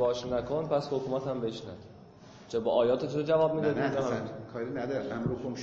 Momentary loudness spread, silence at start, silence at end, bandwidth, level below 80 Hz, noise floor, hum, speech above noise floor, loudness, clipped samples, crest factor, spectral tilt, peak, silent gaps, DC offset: 10 LU; 0 s; 0 s; 7.6 kHz; -60 dBFS; -52 dBFS; none; 21 dB; -31 LUFS; under 0.1%; 16 dB; -6.5 dB/octave; -14 dBFS; none; under 0.1%